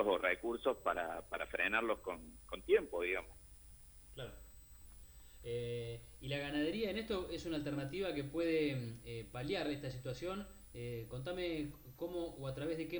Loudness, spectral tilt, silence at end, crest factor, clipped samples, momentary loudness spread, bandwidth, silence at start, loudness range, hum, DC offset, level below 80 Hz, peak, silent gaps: -40 LUFS; -5.5 dB/octave; 0 s; 20 dB; under 0.1%; 22 LU; over 20 kHz; 0 s; 6 LU; none; under 0.1%; -60 dBFS; -20 dBFS; none